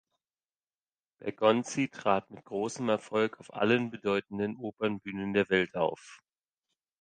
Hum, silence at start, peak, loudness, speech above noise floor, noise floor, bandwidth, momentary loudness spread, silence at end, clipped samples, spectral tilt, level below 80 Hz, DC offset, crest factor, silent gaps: none; 1.2 s; -10 dBFS; -31 LUFS; over 60 dB; under -90 dBFS; 9.6 kHz; 8 LU; 0.85 s; under 0.1%; -5 dB/octave; -70 dBFS; under 0.1%; 22 dB; none